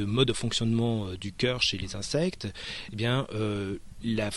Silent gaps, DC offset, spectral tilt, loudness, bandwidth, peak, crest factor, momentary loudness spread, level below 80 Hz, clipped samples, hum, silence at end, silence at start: none; under 0.1%; -5 dB/octave; -29 LUFS; 12 kHz; -10 dBFS; 20 dB; 10 LU; -50 dBFS; under 0.1%; none; 0 s; 0 s